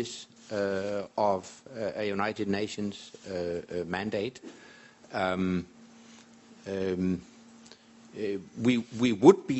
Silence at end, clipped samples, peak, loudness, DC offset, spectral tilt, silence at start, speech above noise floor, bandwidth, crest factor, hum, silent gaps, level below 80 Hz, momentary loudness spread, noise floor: 0 s; under 0.1%; -4 dBFS; -30 LUFS; under 0.1%; -6 dB/octave; 0 s; 25 dB; 8.2 kHz; 26 dB; none; none; -66 dBFS; 16 LU; -54 dBFS